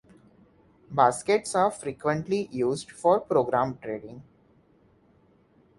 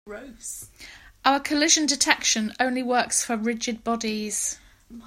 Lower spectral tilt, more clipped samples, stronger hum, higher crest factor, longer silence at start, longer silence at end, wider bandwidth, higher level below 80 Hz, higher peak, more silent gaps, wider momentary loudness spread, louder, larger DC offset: first, -5 dB/octave vs -1 dB/octave; neither; neither; about the same, 22 dB vs 24 dB; first, 0.9 s vs 0.05 s; first, 1.55 s vs 0 s; second, 11.5 kHz vs 16 kHz; second, -64 dBFS vs -58 dBFS; second, -6 dBFS vs 0 dBFS; neither; second, 12 LU vs 18 LU; second, -26 LUFS vs -23 LUFS; neither